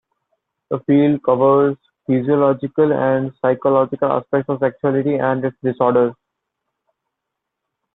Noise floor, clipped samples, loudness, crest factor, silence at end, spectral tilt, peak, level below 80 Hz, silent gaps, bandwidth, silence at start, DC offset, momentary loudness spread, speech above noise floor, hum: -80 dBFS; under 0.1%; -17 LUFS; 16 dB; 1.8 s; -11.5 dB/octave; -2 dBFS; -60 dBFS; none; 4 kHz; 0.7 s; under 0.1%; 6 LU; 63 dB; none